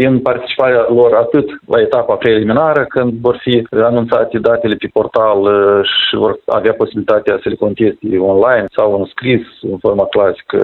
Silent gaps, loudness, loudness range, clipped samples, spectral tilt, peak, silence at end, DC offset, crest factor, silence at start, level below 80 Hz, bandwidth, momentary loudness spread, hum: none; -12 LUFS; 2 LU; under 0.1%; -8.5 dB/octave; 0 dBFS; 0 s; under 0.1%; 12 dB; 0 s; -48 dBFS; 4.3 kHz; 5 LU; none